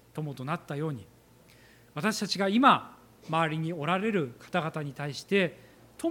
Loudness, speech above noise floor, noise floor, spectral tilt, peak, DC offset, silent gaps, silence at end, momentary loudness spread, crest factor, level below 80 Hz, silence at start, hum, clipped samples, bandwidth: -29 LUFS; 29 dB; -57 dBFS; -5.5 dB/octave; -6 dBFS; under 0.1%; none; 0 s; 14 LU; 24 dB; -70 dBFS; 0.15 s; none; under 0.1%; 17 kHz